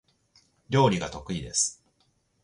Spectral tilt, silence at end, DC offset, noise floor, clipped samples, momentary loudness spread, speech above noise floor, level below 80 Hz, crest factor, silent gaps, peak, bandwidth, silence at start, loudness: -4 dB/octave; 0.7 s; under 0.1%; -70 dBFS; under 0.1%; 10 LU; 44 dB; -54 dBFS; 20 dB; none; -8 dBFS; 11.5 kHz; 0.7 s; -26 LUFS